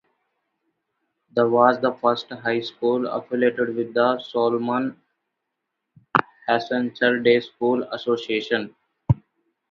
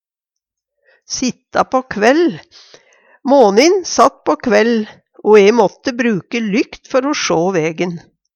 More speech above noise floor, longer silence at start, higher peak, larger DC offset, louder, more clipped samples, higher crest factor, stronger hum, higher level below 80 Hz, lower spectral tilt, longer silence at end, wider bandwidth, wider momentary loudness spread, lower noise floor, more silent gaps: second, 59 dB vs 69 dB; first, 1.35 s vs 1.1 s; about the same, 0 dBFS vs 0 dBFS; neither; second, -22 LUFS vs -14 LUFS; neither; first, 24 dB vs 14 dB; neither; about the same, -52 dBFS vs -56 dBFS; first, -7.5 dB/octave vs -4.5 dB/octave; first, 0.55 s vs 0.4 s; second, 7 kHz vs 10.5 kHz; second, 8 LU vs 12 LU; about the same, -80 dBFS vs -83 dBFS; neither